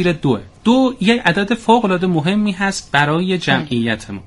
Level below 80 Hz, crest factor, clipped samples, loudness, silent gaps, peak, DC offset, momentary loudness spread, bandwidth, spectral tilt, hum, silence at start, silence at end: -44 dBFS; 16 dB; under 0.1%; -16 LUFS; none; 0 dBFS; under 0.1%; 5 LU; 11.5 kHz; -5.5 dB/octave; none; 0 s; 0.05 s